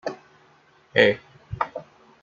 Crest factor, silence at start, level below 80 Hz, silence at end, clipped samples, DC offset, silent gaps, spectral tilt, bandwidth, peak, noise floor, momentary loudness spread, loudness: 24 dB; 0.05 s; -54 dBFS; 0.4 s; under 0.1%; under 0.1%; none; -5.5 dB/octave; 7.6 kHz; -2 dBFS; -57 dBFS; 21 LU; -23 LUFS